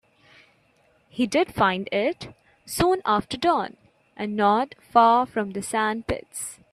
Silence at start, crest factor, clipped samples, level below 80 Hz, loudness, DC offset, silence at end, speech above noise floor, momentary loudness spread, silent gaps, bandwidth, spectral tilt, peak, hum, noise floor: 1.15 s; 20 dB; under 0.1%; -52 dBFS; -23 LUFS; under 0.1%; 0.2 s; 39 dB; 15 LU; none; 14.5 kHz; -4.5 dB/octave; -4 dBFS; none; -62 dBFS